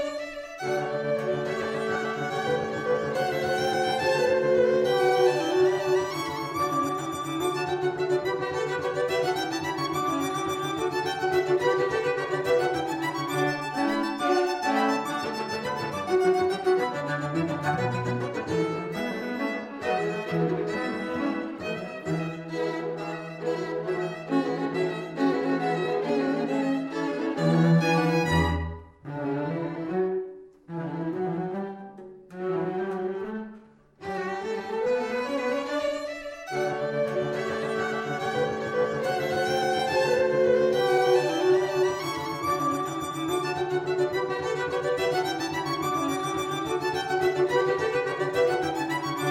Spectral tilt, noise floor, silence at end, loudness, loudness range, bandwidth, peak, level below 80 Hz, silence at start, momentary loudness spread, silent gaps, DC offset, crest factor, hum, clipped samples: -5.5 dB/octave; -51 dBFS; 0 s; -27 LUFS; 7 LU; 16.5 kHz; -10 dBFS; -54 dBFS; 0 s; 9 LU; none; under 0.1%; 16 dB; none; under 0.1%